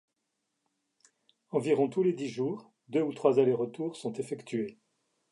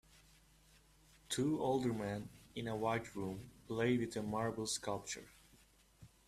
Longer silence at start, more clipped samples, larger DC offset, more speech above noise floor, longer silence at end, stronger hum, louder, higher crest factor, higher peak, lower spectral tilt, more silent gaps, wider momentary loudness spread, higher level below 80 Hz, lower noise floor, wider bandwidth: first, 1.55 s vs 1.3 s; neither; neither; first, 53 dB vs 29 dB; first, 0.6 s vs 0.2 s; neither; first, -31 LUFS vs -40 LUFS; about the same, 22 dB vs 20 dB; first, -10 dBFS vs -22 dBFS; first, -7 dB/octave vs -5 dB/octave; neither; about the same, 11 LU vs 11 LU; second, -82 dBFS vs -68 dBFS; first, -82 dBFS vs -68 dBFS; second, 11.5 kHz vs 14.5 kHz